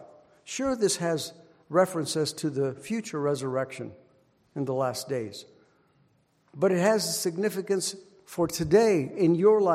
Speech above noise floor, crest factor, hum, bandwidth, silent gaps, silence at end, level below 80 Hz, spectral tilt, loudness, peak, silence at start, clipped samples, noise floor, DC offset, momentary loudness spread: 41 dB; 18 dB; none; 16 kHz; none; 0 s; -62 dBFS; -5 dB/octave; -27 LUFS; -8 dBFS; 0 s; under 0.1%; -67 dBFS; under 0.1%; 16 LU